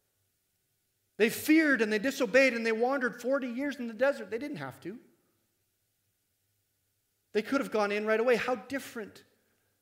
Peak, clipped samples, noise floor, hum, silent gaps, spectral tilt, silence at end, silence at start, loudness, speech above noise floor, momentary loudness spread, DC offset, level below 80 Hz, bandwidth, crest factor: -10 dBFS; under 0.1%; -77 dBFS; none; none; -4.5 dB/octave; 0.6 s; 1.2 s; -29 LUFS; 48 dB; 16 LU; under 0.1%; -78 dBFS; 16 kHz; 20 dB